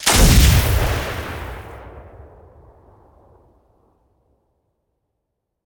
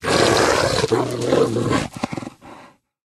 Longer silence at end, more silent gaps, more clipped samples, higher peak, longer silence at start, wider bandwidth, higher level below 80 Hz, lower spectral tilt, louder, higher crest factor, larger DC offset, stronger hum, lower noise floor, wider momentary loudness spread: first, 3.65 s vs 0.45 s; neither; neither; about the same, -2 dBFS vs -2 dBFS; about the same, 0 s vs 0 s; first, 19.5 kHz vs 13.5 kHz; first, -24 dBFS vs -44 dBFS; about the same, -4 dB/octave vs -4 dB/octave; first, -16 LUFS vs -19 LUFS; about the same, 18 dB vs 18 dB; neither; neither; first, -77 dBFS vs -47 dBFS; first, 26 LU vs 13 LU